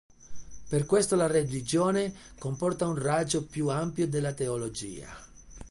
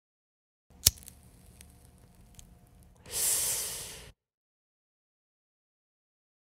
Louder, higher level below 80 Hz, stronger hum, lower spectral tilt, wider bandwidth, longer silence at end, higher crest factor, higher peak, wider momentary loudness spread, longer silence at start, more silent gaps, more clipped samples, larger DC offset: about the same, -29 LUFS vs -28 LUFS; about the same, -54 dBFS vs -54 dBFS; neither; first, -5.5 dB/octave vs 0 dB/octave; second, 11.5 kHz vs 16 kHz; second, 0 s vs 2.4 s; second, 16 dB vs 38 dB; second, -12 dBFS vs 0 dBFS; second, 13 LU vs 22 LU; second, 0.2 s vs 0.85 s; neither; neither; neither